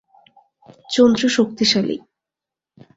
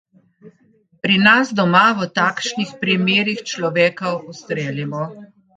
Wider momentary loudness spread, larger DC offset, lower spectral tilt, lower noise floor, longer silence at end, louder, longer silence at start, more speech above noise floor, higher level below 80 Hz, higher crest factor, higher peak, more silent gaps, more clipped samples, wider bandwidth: second, 10 LU vs 13 LU; neither; about the same, -4 dB/octave vs -4.5 dB/octave; first, -87 dBFS vs -57 dBFS; first, 1 s vs 0.3 s; about the same, -17 LUFS vs -17 LUFS; first, 0.9 s vs 0.45 s; first, 70 dB vs 39 dB; first, -58 dBFS vs -64 dBFS; about the same, 18 dB vs 18 dB; about the same, -2 dBFS vs 0 dBFS; neither; neither; second, 8 kHz vs 9 kHz